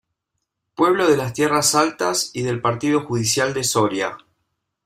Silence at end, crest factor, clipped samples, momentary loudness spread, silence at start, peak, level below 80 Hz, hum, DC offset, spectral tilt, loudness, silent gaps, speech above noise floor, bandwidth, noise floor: 0.7 s; 18 dB; under 0.1%; 7 LU; 0.8 s; -4 dBFS; -58 dBFS; none; under 0.1%; -3.5 dB/octave; -19 LUFS; none; 59 dB; 16 kHz; -78 dBFS